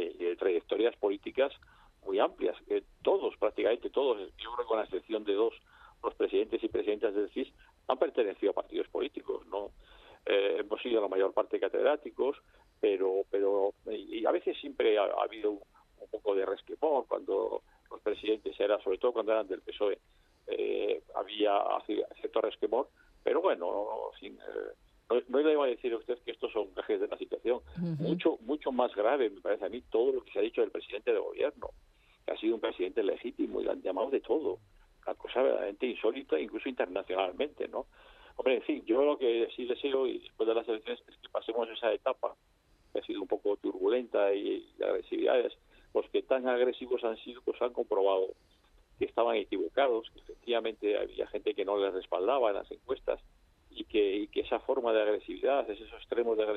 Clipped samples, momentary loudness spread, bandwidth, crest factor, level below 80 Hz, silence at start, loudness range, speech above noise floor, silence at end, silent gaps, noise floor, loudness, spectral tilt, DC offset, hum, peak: under 0.1%; 10 LU; 4.8 kHz; 20 dB; -66 dBFS; 0 s; 2 LU; 35 dB; 0 s; none; -67 dBFS; -33 LUFS; -7.5 dB/octave; under 0.1%; none; -12 dBFS